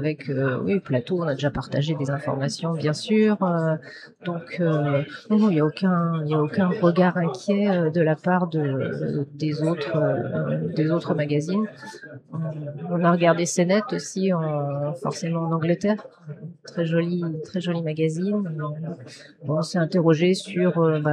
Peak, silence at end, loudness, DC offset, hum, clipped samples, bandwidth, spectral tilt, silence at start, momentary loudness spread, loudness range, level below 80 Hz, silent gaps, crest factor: -6 dBFS; 0 s; -23 LUFS; under 0.1%; none; under 0.1%; 10.5 kHz; -6.5 dB/octave; 0 s; 11 LU; 4 LU; -62 dBFS; none; 16 dB